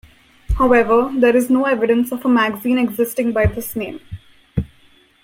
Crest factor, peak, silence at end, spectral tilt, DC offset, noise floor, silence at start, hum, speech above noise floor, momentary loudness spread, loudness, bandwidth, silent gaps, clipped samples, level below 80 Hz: 16 dB; -2 dBFS; 0.6 s; -6.5 dB/octave; under 0.1%; -52 dBFS; 0.5 s; none; 36 dB; 14 LU; -17 LUFS; 16.5 kHz; none; under 0.1%; -32 dBFS